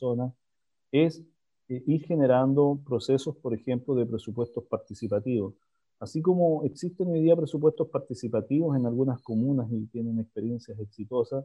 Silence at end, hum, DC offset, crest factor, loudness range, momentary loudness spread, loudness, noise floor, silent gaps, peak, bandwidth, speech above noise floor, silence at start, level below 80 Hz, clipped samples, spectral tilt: 0 s; none; under 0.1%; 18 dB; 3 LU; 11 LU; -28 LUFS; -88 dBFS; none; -10 dBFS; 11 kHz; 61 dB; 0 s; -68 dBFS; under 0.1%; -8.5 dB/octave